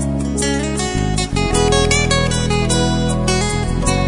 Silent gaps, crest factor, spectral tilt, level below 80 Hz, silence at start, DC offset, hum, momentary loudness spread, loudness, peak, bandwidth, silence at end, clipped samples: none; 14 dB; -4.5 dB/octave; -24 dBFS; 0 s; under 0.1%; none; 5 LU; -16 LUFS; -2 dBFS; 11 kHz; 0 s; under 0.1%